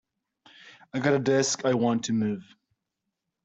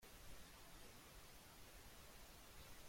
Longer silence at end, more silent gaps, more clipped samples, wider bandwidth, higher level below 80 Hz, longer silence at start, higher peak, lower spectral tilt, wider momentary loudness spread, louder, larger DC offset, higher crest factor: first, 1 s vs 0 s; neither; neither; second, 8.2 kHz vs 16.5 kHz; about the same, -68 dBFS vs -66 dBFS; first, 0.65 s vs 0 s; first, -10 dBFS vs -44 dBFS; first, -4.5 dB/octave vs -2.5 dB/octave; first, 9 LU vs 1 LU; first, -26 LUFS vs -61 LUFS; neither; about the same, 18 dB vs 16 dB